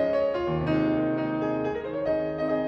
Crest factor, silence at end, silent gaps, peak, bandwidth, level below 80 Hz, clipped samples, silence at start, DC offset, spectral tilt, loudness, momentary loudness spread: 12 dB; 0 s; none; -14 dBFS; 6.2 kHz; -50 dBFS; under 0.1%; 0 s; under 0.1%; -9 dB/octave; -27 LUFS; 4 LU